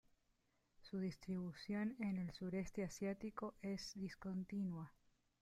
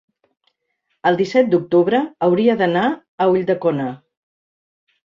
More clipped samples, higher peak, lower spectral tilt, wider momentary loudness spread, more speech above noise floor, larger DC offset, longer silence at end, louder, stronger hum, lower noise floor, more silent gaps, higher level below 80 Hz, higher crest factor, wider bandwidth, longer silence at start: neither; second, -34 dBFS vs -2 dBFS; about the same, -6.5 dB/octave vs -7.5 dB/octave; about the same, 5 LU vs 6 LU; second, 36 dB vs 55 dB; neither; second, 0.5 s vs 1.1 s; second, -47 LUFS vs -18 LUFS; neither; first, -82 dBFS vs -71 dBFS; second, none vs 3.08-3.18 s; second, -70 dBFS vs -62 dBFS; about the same, 14 dB vs 16 dB; first, 13 kHz vs 7.4 kHz; second, 0.8 s vs 1.05 s